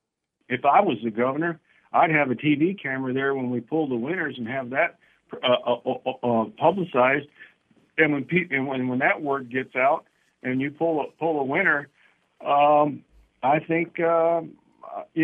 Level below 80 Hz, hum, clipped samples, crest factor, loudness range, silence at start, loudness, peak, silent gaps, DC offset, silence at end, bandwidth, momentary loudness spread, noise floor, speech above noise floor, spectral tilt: -70 dBFS; none; under 0.1%; 20 dB; 3 LU; 0.5 s; -24 LUFS; -4 dBFS; none; under 0.1%; 0 s; 3.9 kHz; 9 LU; -64 dBFS; 41 dB; -8.5 dB/octave